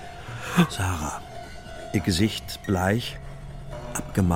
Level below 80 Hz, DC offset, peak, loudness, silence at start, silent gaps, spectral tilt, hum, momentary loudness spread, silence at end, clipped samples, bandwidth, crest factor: -42 dBFS; 0.3%; -6 dBFS; -26 LUFS; 0 s; none; -5 dB/octave; none; 17 LU; 0 s; under 0.1%; 16.5 kHz; 20 dB